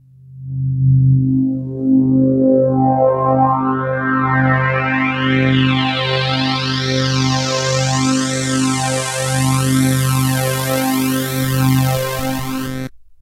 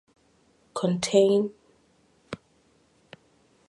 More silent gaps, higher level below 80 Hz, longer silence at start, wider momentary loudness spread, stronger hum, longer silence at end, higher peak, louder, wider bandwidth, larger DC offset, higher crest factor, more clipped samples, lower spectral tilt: neither; first, -42 dBFS vs -68 dBFS; second, 0.25 s vs 0.75 s; second, 7 LU vs 22 LU; neither; second, 0.1 s vs 1.35 s; first, 0 dBFS vs -8 dBFS; first, -16 LUFS vs -24 LUFS; first, 16 kHz vs 11.5 kHz; neither; second, 14 dB vs 22 dB; neither; about the same, -5 dB/octave vs -5.5 dB/octave